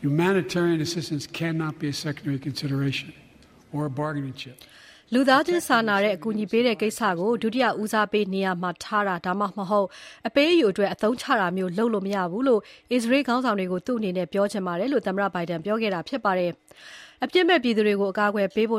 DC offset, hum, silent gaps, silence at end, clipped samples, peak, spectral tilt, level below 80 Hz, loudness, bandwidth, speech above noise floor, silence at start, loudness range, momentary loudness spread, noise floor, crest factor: under 0.1%; none; none; 0 s; under 0.1%; -6 dBFS; -5.5 dB/octave; -64 dBFS; -24 LUFS; 15.5 kHz; 26 dB; 0 s; 6 LU; 10 LU; -50 dBFS; 20 dB